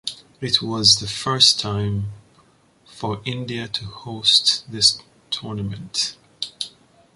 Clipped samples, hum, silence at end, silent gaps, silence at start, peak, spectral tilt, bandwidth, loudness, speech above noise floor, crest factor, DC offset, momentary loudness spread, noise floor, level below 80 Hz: under 0.1%; none; 0.45 s; none; 0.05 s; 0 dBFS; -2.5 dB/octave; 11.5 kHz; -19 LUFS; 35 dB; 22 dB; under 0.1%; 17 LU; -56 dBFS; -50 dBFS